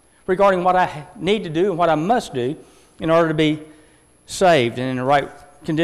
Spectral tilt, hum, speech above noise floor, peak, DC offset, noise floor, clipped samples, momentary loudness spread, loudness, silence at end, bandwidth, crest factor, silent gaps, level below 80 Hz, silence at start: -5.5 dB/octave; none; 34 dB; -6 dBFS; under 0.1%; -52 dBFS; under 0.1%; 12 LU; -19 LUFS; 0 s; 13.5 kHz; 14 dB; none; -50 dBFS; 0.3 s